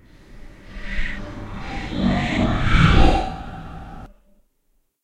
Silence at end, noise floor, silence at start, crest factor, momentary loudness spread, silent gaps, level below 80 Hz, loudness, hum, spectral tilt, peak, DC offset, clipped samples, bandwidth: 0.95 s; -66 dBFS; 0.3 s; 20 dB; 22 LU; none; -24 dBFS; -21 LUFS; none; -6.5 dB/octave; -2 dBFS; under 0.1%; under 0.1%; 9.2 kHz